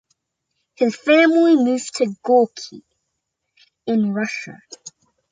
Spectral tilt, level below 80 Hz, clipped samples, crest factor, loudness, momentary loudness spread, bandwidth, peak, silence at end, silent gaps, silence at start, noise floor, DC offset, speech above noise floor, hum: -5 dB/octave; -72 dBFS; under 0.1%; 18 dB; -18 LUFS; 23 LU; 9.4 kHz; -2 dBFS; 0.45 s; none; 0.8 s; -77 dBFS; under 0.1%; 59 dB; none